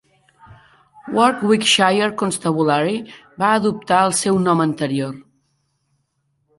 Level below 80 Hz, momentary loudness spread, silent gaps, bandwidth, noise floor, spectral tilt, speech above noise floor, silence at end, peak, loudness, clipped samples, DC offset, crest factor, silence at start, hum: -60 dBFS; 10 LU; none; 12 kHz; -68 dBFS; -4 dB/octave; 51 dB; 1.35 s; -2 dBFS; -17 LUFS; under 0.1%; under 0.1%; 18 dB; 0.5 s; none